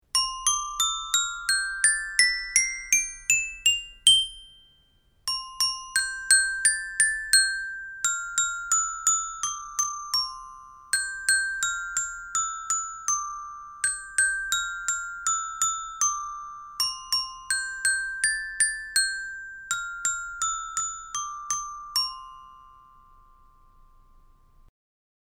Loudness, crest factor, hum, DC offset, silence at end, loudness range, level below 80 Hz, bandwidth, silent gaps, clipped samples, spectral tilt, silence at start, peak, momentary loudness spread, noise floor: -24 LUFS; 26 dB; none; under 0.1%; 2.6 s; 7 LU; -56 dBFS; over 20 kHz; none; under 0.1%; 4.5 dB/octave; 0.15 s; -2 dBFS; 11 LU; -63 dBFS